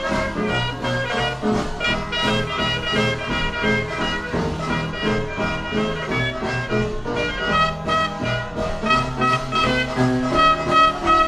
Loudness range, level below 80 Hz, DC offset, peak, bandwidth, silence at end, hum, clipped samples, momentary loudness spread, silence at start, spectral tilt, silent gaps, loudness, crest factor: 4 LU; -36 dBFS; under 0.1%; -4 dBFS; 13 kHz; 0 s; none; under 0.1%; 7 LU; 0 s; -5 dB/octave; none; -21 LUFS; 16 dB